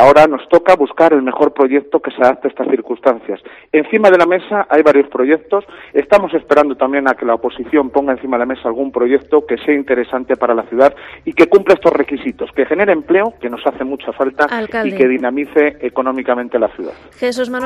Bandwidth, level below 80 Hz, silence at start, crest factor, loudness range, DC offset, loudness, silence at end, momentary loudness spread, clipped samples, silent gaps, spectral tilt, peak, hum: 12 kHz; -50 dBFS; 0 s; 14 dB; 3 LU; under 0.1%; -14 LUFS; 0 s; 9 LU; 0.4%; none; -6 dB/octave; 0 dBFS; none